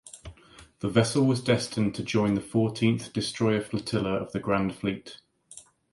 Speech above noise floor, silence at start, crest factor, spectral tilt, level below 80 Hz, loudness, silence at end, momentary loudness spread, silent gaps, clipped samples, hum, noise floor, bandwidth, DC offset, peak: 27 dB; 0.05 s; 20 dB; -6 dB/octave; -56 dBFS; -27 LUFS; 0.3 s; 22 LU; none; under 0.1%; none; -53 dBFS; 11.5 kHz; under 0.1%; -8 dBFS